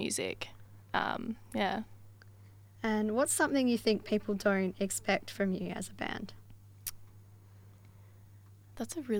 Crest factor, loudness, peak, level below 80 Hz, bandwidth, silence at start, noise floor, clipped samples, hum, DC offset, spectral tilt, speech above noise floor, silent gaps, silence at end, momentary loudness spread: 20 dB; -33 LUFS; -14 dBFS; -62 dBFS; over 20 kHz; 0 s; -56 dBFS; under 0.1%; none; under 0.1%; -4 dB/octave; 23 dB; none; 0 s; 14 LU